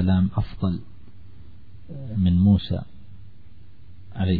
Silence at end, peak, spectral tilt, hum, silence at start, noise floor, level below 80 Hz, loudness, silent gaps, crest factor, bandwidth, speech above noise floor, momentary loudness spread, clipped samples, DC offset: 0 s; -8 dBFS; -11.5 dB/octave; none; 0 s; -50 dBFS; -42 dBFS; -23 LUFS; none; 16 dB; 4.9 kHz; 28 dB; 22 LU; under 0.1%; 1%